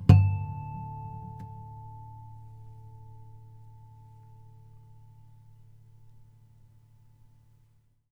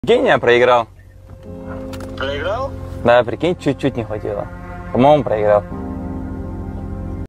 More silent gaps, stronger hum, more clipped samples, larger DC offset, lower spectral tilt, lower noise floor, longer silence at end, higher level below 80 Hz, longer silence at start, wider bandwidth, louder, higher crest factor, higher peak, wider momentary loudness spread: neither; neither; neither; second, under 0.1% vs 0.1%; first, -9 dB/octave vs -6.5 dB/octave; first, -64 dBFS vs -39 dBFS; first, 4.4 s vs 0 s; second, -48 dBFS vs -36 dBFS; about the same, 0 s vs 0.05 s; second, 5.2 kHz vs 11 kHz; second, -30 LUFS vs -17 LUFS; first, 28 dB vs 16 dB; second, -4 dBFS vs 0 dBFS; first, 23 LU vs 17 LU